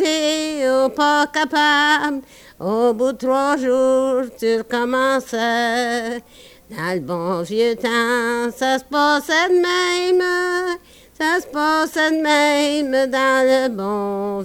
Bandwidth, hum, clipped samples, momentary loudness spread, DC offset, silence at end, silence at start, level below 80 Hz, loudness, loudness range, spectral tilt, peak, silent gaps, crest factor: 19 kHz; none; under 0.1%; 8 LU; under 0.1%; 0 s; 0 s; -56 dBFS; -18 LUFS; 3 LU; -3.5 dB/octave; -6 dBFS; none; 14 dB